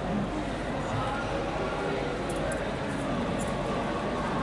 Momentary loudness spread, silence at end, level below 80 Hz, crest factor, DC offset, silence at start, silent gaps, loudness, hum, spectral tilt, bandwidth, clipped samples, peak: 2 LU; 0 s; -42 dBFS; 12 dB; under 0.1%; 0 s; none; -31 LUFS; none; -6 dB/octave; 11.5 kHz; under 0.1%; -18 dBFS